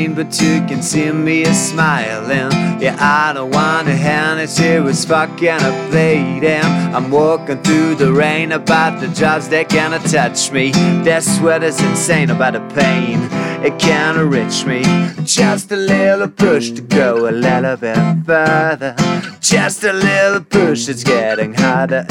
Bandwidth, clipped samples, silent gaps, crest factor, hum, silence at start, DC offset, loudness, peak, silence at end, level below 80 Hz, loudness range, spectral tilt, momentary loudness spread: 16 kHz; under 0.1%; none; 14 dB; none; 0 s; under 0.1%; -13 LUFS; 0 dBFS; 0 s; -50 dBFS; 1 LU; -4.5 dB/octave; 4 LU